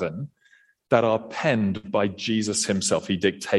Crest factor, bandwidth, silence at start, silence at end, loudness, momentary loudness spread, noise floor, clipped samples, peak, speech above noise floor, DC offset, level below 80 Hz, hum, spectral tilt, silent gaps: 18 dB; 12.5 kHz; 0 s; 0 s; -24 LUFS; 5 LU; -60 dBFS; under 0.1%; -6 dBFS; 36 dB; under 0.1%; -62 dBFS; none; -4 dB/octave; none